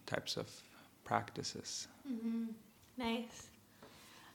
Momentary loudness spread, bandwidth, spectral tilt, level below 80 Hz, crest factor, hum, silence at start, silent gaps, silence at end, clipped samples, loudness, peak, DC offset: 19 LU; 19 kHz; -3.5 dB/octave; -74 dBFS; 28 dB; none; 0 s; none; 0 s; under 0.1%; -42 LUFS; -16 dBFS; under 0.1%